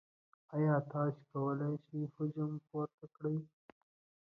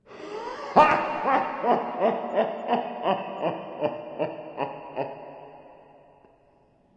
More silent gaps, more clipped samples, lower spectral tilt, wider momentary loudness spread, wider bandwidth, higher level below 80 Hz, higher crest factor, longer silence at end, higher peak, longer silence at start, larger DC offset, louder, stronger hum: first, 2.94-2.98 s vs none; neither; first, -10.5 dB/octave vs -6 dB/octave; second, 10 LU vs 16 LU; second, 2.3 kHz vs 8.8 kHz; second, -82 dBFS vs -66 dBFS; second, 16 dB vs 24 dB; second, 0.9 s vs 1.2 s; second, -24 dBFS vs -4 dBFS; first, 0.5 s vs 0.1 s; neither; second, -39 LUFS vs -26 LUFS; neither